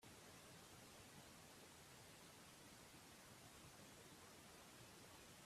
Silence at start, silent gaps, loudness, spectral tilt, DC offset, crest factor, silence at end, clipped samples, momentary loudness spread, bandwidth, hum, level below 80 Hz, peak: 0 s; none; -62 LUFS; -3 dB/octave; under 0.1%; 16 dB; 0 s; under 0.1%; 1 LU; 15.5 kHz; none; -82 dBFS; -48 dBFS